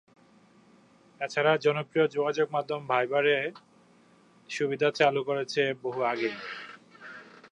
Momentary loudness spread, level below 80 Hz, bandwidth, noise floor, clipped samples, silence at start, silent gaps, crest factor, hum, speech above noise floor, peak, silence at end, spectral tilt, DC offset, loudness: 19 LU; -80 dBFS; 10 kHz; -60 dBFS; under 0.1%; 1.2 s; none; 22 dB; none; 32 dB; -8 dBFS; 0.2 s; -5 dB/octave; under 0.1%; -28 LUFS